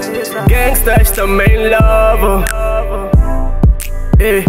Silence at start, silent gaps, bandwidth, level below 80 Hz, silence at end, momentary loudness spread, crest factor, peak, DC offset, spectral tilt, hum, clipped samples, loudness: 0 s; none; 16.5 kHz; -12 dBFS; 0 s; 7 LU; 10 dB; 0 dBFS; under 0.1%; -5.5 dB/octave; none; under 0.1%; -12 LUFS